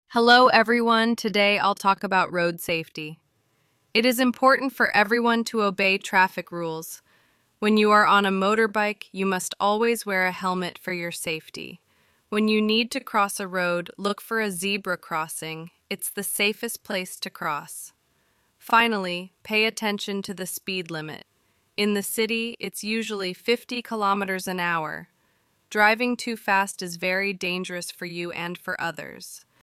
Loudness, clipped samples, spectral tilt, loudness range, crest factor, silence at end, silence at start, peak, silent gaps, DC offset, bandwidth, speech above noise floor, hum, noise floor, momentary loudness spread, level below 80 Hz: -23 LUFS; under 0.1%; -3.5 dB/octave; 6 LU; 20 dB; 0.3 s; 0.1 s; -4 dBFS; none; under 0.1%; 16 kHz; 44 dB; none; -68 dBFS; 13 LU; -70 dBFS